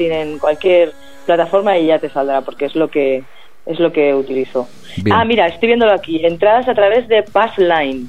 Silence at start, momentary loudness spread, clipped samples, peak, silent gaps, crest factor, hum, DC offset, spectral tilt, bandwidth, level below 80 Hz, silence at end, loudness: 0 s; 9 LU; under 0.1%; 0 dBFS; none; 14 dB; none; 2%; -6.5 dB/octave; 9.4 kHz; -50 dBFS; 0 s; -14 LUFS